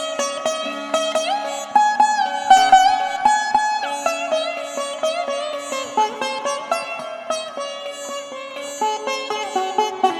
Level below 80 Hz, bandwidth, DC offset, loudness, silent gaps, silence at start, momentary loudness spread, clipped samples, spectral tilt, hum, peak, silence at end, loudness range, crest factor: -60 dBFS; 14 kHz; under 0.1%; -20 LUFS; none; 0 s; 14 LU; under 0.1%; -0.5 dB/octave; none; 0 dBFS; 0 s; 8 LU; 20 dB